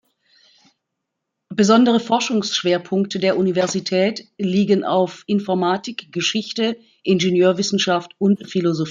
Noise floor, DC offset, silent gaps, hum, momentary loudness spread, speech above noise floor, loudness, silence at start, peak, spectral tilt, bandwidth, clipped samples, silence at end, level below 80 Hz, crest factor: -79 dBFS; under 0.1%; none; none; 7 LU; 60 dB; -19 LUFS; 1.5 s; -2 dBFS; -5 dB/octave; 7.6 kHz; under 0.1%; 0 s; -64 dBFS; 16 dB